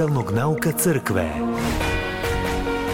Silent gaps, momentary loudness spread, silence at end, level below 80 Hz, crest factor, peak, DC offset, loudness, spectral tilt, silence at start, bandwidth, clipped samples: none; 4 LU; 0 s; -34 dBFS; 14 dB; -8 dBFS; under 0.1%; -22 LUFS; -5 dB/octave; 0 s; 17 kHz; under 0.1%